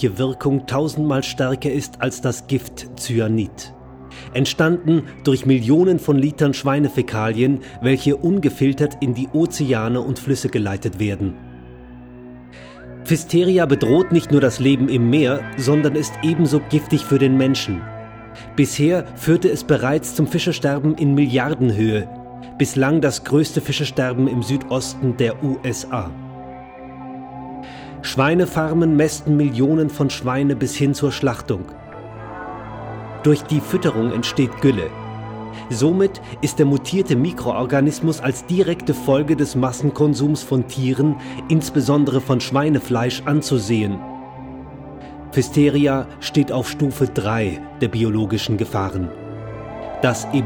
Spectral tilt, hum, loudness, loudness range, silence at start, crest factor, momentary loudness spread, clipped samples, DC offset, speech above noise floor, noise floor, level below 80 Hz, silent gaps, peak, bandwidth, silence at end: -6 dB/octave; none; -19 LUFS; 5 LU; 0 s; 16 dB; 17 LU; under 0.1%; under 0.1%; 21 dB; -39 dBFS; -46 dBFS; none; -2 dBFS; 19.5 kHz; 0 s